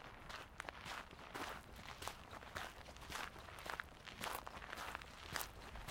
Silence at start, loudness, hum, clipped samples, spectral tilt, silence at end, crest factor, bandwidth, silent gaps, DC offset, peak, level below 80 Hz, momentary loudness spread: 0 s; -50 LUFS; none; under 0.1%; -2.5 dB/octave; 0 s; 30 dB; 16.5 kHz; none; under 0.1%; -20 dBFS; -62 dBFS; 6 LU